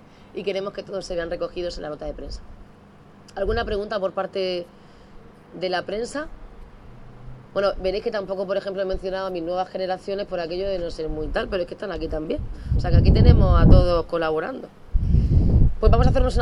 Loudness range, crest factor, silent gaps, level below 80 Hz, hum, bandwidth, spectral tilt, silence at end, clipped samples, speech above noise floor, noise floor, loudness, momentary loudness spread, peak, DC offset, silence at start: 11 LU; 22 dB; none; -26 dBFS; none; 10.5 kHz; -7.5 dB/octave; 0 s; under 0.1%; 27 dB; -48 dBFS; -23 LUFS; 16 LU; 0 dBFS; under 0.1%; 0.35 s